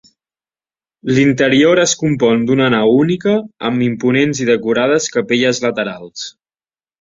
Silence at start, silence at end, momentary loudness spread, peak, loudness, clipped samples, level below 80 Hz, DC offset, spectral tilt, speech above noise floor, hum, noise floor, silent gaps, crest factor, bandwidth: 1.05 s; 0.7 s; 11 LU; -2 dBFS; -14 LUFS; under 0.1%; -54 dBFS; under 0.1%; -4.5 dB/octave; over 76 dB; none; under -90 dBFS; none; 14 dB; 7.8 kHz